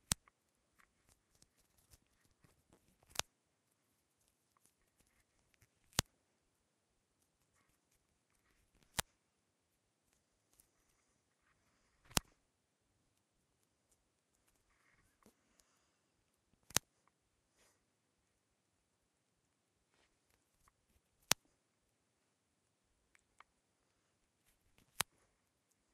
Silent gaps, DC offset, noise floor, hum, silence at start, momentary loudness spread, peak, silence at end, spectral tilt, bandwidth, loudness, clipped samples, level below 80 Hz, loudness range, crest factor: none; under 0.1%; -83 dBFS; none; 6 s; 6 LU; -4 dBFS; 9.15 s; -1.5 dB/octave; 13 kHz; -41 LUFS; under 0.1%; -68 dBFS; 6 LU; 48 dB